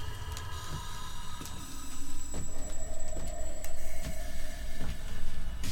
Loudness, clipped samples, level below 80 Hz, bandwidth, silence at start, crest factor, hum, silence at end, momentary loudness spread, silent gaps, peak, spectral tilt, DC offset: -42 LUFS; under 0.1%; -36 dBFS; 15.5 kHz; 0 s; 12 dB; none; 0 s; 2 LU; none; -16 dBFS; -3.5 dB/octave; under 0.1%